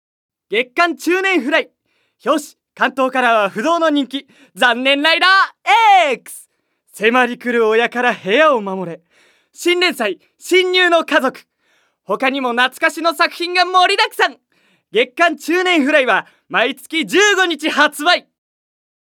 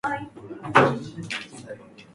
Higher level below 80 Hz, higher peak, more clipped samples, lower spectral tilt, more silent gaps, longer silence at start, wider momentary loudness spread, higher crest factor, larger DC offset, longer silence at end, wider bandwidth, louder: second, -78 dBFS vs -60 dBFS; about the same, 0 dBFS vs -2 dBFS; neither; second, -2.5 dB/octave vs -5.5 dB/octave; neither; first, 0.5 s vs 0.05 s; second, 9 LU vs 22 LU; second, 16 dB vs 24 dB; neither; first, 1 s vs 0.1 s; first, 18.5 kHz vs 11.5 kHz; first, -15 LUFS vs -24 LUFS